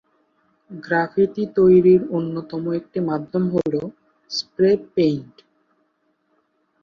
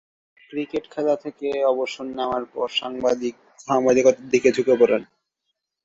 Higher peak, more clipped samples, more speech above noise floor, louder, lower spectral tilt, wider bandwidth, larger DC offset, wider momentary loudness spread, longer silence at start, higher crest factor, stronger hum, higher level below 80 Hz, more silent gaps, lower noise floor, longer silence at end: about the same, -4 dBFS vs -4 dBFS; neither; second, 48 dB vs 57 dB; about the same, -20 LUFS vs -22 LUFS; first, -7 dB/octave vs -4 dB/octave; second, 7 kHz vs 7.8 kHz; neither; first, 14 LU vs 11 LU; first, 0.7 s vs 0.5 s; about the same, 16 dB vs 18 dB; neither; about the same, -58 dBFS vs -62 dBFS; neither; second, -68 dBFS vs -78 dBFS; first, 1.6 s vs 0.8 s